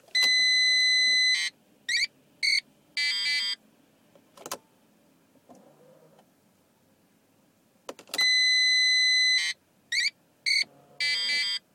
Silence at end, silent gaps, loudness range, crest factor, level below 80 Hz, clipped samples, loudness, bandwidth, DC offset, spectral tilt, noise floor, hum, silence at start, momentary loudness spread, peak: 0.15 s; none; 9 LU; 18 dB; -86 dBFS; under 0.1%; -23 LUFS; 16.5 kHz; under 0.1%; 3 dB/octave; -65 dBFS; none; 0.15 s; 15 LU; -10 dBFS